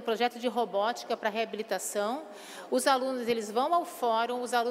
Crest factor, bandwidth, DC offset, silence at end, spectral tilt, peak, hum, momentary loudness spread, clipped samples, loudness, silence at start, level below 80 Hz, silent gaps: 20 dB; 16 kHz; under 0.1%; 0 s; -2.5 dB/octave; -10 dBFS; none; 6 LU; under 0.1%; -30 LUFS; 0 s; -80 dBFS; none